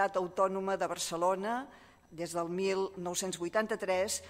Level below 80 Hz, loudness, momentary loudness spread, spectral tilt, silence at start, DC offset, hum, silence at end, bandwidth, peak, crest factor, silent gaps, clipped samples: -68 dBFS; -34 LUFS; 7 LU; -3.5 dB/octave; 0 s; under 0.1%; none; 0 s; 16 kHz; -16 dBFS; 18 dB; none; under 0.1%